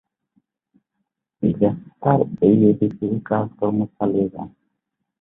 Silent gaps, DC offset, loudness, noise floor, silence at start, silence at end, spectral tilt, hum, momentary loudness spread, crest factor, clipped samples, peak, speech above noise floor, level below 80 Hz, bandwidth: none; under 0.1%; -20 LUFS; -78 dBFS; 1.4 s; 0.7 s; -13 dB/octave; none; 10 LU; 18 dB; under 0.1%; -2 dBFS; 59 dB; -54 dBFS; 3.8 kHz